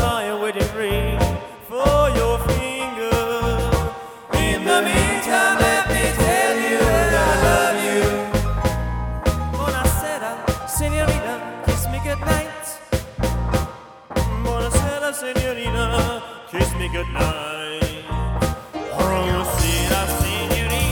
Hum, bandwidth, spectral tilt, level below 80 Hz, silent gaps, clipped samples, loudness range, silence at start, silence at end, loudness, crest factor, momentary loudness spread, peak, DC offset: none; 19.5 kHz; -4.5 dB/octave; -28 dBFS; none; under 0.1%; 6 LU; 0 s; 0 s; -20 LUFS; 18 dB; 9 LU; -2 dBFS; under 0.1%